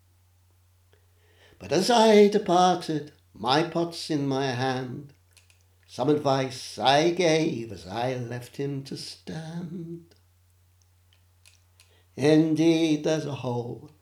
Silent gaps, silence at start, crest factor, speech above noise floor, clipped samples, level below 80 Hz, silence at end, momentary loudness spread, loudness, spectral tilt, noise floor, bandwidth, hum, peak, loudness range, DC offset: none; 1.6 s; 20 dB; 37 dB; under 0.1%; -70 dBFS; 0.15 s; 18 LU; -24 LUFS; -5.5 dB/octave; -62 dBFS; 15 kHz; none; -6 dBFS; 14 LU; under 0.1%